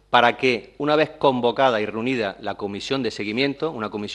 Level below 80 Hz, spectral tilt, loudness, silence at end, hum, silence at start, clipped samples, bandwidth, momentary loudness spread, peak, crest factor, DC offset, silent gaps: -58 dBFS; -5 dB/octave; -22 LUFS; 0 s; none; 0.1 s; under 0.1%; 11 kHz; 9 LU; 0 dBFS; 22 dB; under 0.1%; none